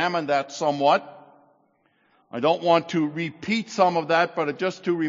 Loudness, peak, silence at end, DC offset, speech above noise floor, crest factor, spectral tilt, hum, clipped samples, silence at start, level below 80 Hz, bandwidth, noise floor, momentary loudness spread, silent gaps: -23 LUFS; -4 dBFS; 0 s; under 0.1%; 42 dB; 20 dB; -3.5 dB/octave; none; under 0.1%; 0 s; -74 dBFS; 7.6 kHz; -65 dBFS; 7 LU; none